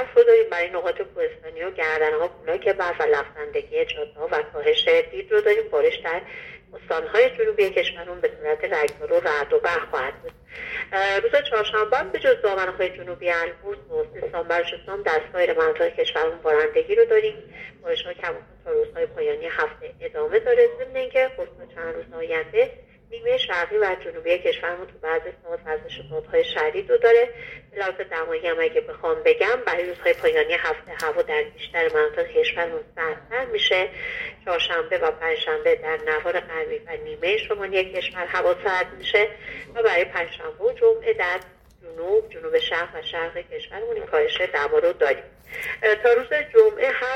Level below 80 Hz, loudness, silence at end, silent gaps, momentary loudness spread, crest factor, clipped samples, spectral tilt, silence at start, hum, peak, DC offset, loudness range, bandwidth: -54 dBFS; -23 LUFS; 0 s; none; 12 LU; 20 dB; under 0.1%; -3.5 dB/octave; 0 s; none; -4 dBFS; under 0.1%; 3 LU; 11.5 kHz